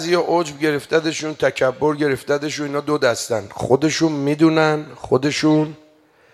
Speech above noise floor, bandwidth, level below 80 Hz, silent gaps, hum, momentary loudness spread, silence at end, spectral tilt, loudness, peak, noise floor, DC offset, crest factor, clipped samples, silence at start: 34 dB; 13.5 kHz; -56 dBFS; none; none; 7 LU; 0.6 s; -5 dB/octave; -19 LUFS; 0 dBFS; -53 dBFS; under 0.1%; 18 dB; under 0.1%; 0 s